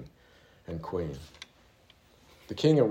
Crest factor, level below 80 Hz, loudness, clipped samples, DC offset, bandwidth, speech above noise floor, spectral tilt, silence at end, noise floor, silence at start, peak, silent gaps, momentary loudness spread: 20 dB; -58 dBFS; -31 LUFS; under 0.1%; under 0.1%; 14 kHz; 33 dB; -7.5 dB/octave; 0 s; -61 dBFS; 0 s; -12 dBFS; none; 25 LU